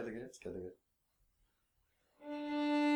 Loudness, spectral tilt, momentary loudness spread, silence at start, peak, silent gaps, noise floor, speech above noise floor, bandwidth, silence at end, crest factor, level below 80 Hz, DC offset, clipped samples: -41 LUFS; -5 dB/octave; 16 LU; 0 s; -24 dBFS; none; -80 dBFS; 39 dB; 9.6 kHz; 0 s; 16 dB; -74 dBFS; under 0.1%; under 0.1%